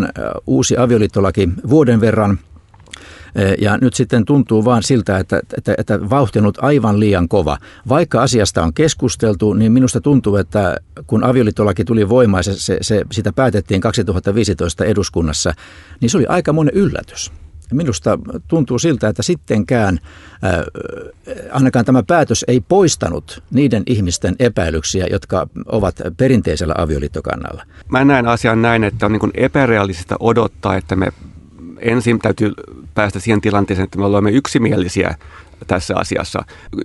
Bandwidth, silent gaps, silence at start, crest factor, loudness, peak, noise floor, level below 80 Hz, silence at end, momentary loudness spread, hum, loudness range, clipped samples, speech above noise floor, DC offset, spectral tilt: 11.5 kHz; none; 0 s; 14 dB; -15 LUFS; 0 dBFS; -38 dBFS; -38 dBFS; 0 s; 9 LU; none; 3 LU; under 0.1%; 24 dB; under 0.1%; -6 dB/octave